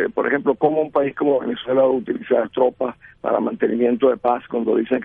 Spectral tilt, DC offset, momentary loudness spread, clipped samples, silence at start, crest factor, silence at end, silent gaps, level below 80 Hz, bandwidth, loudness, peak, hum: -9.5 dB/octave; under 0.1%; 5 LU; under 0.1%; 0 s; 14 dB; 0 s; none; -60 dBFS; 3.8 kHz; -20 LUFS; -4 dBFS; none